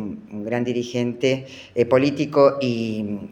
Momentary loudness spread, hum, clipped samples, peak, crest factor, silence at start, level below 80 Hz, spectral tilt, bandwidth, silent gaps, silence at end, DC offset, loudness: 11 LU; none; under 0.1%; -2 dBFS; 18 dB; 0 s; -62 dBFS; -6.5 dB/octave; 9 kHz; none; 0 s; under 0.1%; -21 LUFS